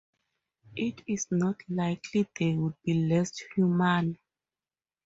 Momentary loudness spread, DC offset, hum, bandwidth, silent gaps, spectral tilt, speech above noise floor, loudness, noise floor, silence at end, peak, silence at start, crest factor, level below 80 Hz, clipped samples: 9 LU; under 0.1%; none; 7.8 kHz; none; -6 dB/octave; over 62 dB; -29 LUFS; under -90 dBFS; 0.9 s; -12 dBFS; 0.75 s; 18 dB; -66 dBFS; under 0.1%